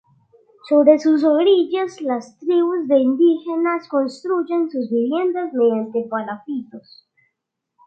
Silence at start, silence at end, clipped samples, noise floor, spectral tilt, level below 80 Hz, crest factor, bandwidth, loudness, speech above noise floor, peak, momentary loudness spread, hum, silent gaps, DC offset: 0.65 s; 1.05 s; under 0.1%; -78 dBFS; -6 dB/octave; -74 dBFS; 18 dB; 8 kHz; -19 LUFS; 60 dB; 0 dBFS; 11 LU; none; none; under 0.1%